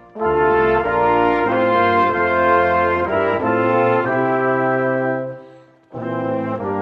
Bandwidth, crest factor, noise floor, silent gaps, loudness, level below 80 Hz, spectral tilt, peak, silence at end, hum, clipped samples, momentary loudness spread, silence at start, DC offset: 6 kHz; 16 dB; -45 dBFS; none; -17 LUFS; -46 dBFS; -8.5 dB/octave; -2 dBFS; 0 s; none; under 0.1%; 9 LU; 0.15 s; under 0.1%